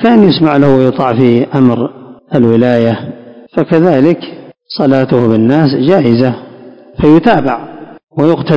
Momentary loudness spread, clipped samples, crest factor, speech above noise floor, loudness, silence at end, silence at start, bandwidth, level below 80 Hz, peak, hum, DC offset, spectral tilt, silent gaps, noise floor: 13 LU; 3%; 10 dB; 26 dB; -10 LUFS; 0 s; 0 s; 7 kHz; -42 dBFS; 0 dBFS; none; under 0.1%; -9 dB/octave; none; -34 dBFS